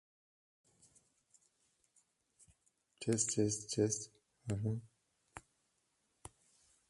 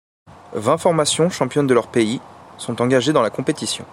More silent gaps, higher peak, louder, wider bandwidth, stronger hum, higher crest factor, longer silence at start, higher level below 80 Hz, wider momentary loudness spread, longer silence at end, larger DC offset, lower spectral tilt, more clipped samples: neither; second, -20 dBFS vs -2 dBFS; second, -37 LUFS vs -19 LUFS; second, 11.5 kHz vs 15.5 kHz; neither; first, 22 dB vs 16 dB; first, 3 s vs 0.5 s; second, -70 dBFS vs -58 dBFS; first, 24 LU vs 12 LU; first, 1.5 s vs 0.05 s; neither; about the same, -4.5 dB/octave vs -4.5 dB/octave; neither